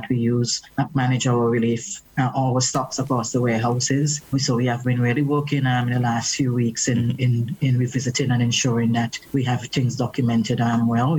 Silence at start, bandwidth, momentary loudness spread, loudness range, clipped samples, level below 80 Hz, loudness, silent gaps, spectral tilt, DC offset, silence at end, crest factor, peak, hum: 0 s; 17.5 kHz; 4 LU; 1 LU; under 0.1%; -56 dBFS; -21 LUFS; none; -5 dB/octave; under 0.1%; 0 s; 12 dB; -8 dBFS; none